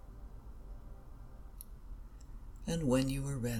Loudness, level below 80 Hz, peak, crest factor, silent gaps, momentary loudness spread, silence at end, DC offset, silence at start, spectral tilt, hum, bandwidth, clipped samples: -35 LUFS; -48 dBFS; -18 dBFS; 20 dB; none; 22 LU; 0 s; under 0.1%; 0 s; -6 dB/octave; none; 18 kHz; under 0.1%